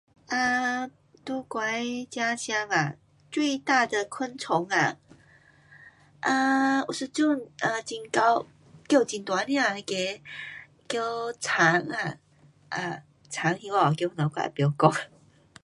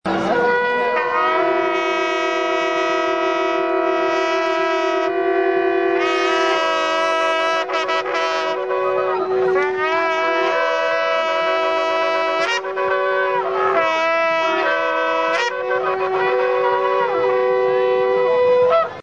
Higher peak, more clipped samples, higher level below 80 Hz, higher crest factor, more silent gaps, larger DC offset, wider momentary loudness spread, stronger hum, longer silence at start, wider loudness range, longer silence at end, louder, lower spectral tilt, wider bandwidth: about the same, -4 dBFS vs -4 dBFS; neither; second, -70 dBFS vs -62 dBFS; first, 24 dB vs 14 dB; neither; second, under 0.1% vs 0.2%; first, 13 LU vs 3 LU; neither; first, 0.3 s vs 0.05 s; about the same, 2 LU vs 1 LU; first, 0.6 s vs 0 s; second, -27 LUFS vs -18 LUFS; about the same, -4.5 dB/octave vs -3.5 dB/octave; first, 11.5 kHz vs 9.4 kHz